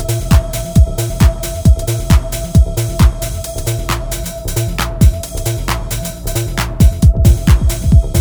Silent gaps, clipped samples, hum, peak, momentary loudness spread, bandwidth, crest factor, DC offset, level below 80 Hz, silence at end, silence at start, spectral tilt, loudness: none; under 0.1%; none; 0 dBFS; 9 LU; over 20 kHz; 12 dB; under 0.1%; -16 dBFS; 0 s; 0 s; -5.5 dB/octave; -14 LUFS